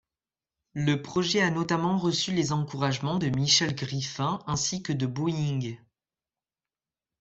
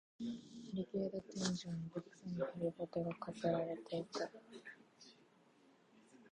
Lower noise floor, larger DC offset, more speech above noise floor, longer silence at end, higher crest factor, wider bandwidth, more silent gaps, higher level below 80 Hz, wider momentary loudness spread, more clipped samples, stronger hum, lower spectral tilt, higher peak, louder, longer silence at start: first, under -90 dBFS vs -70 dBFS; neither; first, over 63 dB vs 27 dB; first, 1.45 s vs 0.05 s; about the same, 20 dB vs 22 dB; second, 8 kHz vs 10.5 kHz; neither; first, -60 dBFS vs -76 dBFS; second, 9 LU vs 16 LU; neither; neither; second, -4 dB/octave vs -5.5 dB/octave; first, -8 dBFS vs -22 dBFS; first, -27 LUFS vs -44 LUFS; first, 0.75 s vs 0.2 s